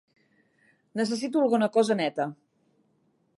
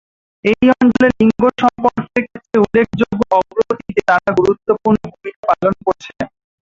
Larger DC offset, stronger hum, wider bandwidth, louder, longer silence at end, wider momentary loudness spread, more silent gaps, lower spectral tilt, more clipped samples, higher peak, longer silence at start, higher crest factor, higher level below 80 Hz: neither; neither; first, 11.5 kHz vs 7.6 kHz; second, -26 LUFS vs -15 LUFS; first, 1.05 s vs 0.5 s; about the same, 10 LU vs 9 LU; second, none vs 5.36-5.43 s; second, -5 dB/octave vs -7 dB/octave; neither; second, -10 dBFS vs -2 dBFS; first, 0.95 s vs 0.45 s; about the same, 18 dB vs 14 dB; second, -82 dBFS vs -46 dBFS